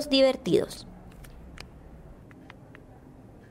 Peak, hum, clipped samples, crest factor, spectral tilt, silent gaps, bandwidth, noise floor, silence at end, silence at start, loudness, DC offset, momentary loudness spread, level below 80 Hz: -10 dBFS; none; under 0.1%; 20 dB; -5 dB/octave; none; 16 kHz; -50 dBFS; 1.55 s; 0 s; -25 LUFS; under 0.1%; 28 LU; -52 dBFS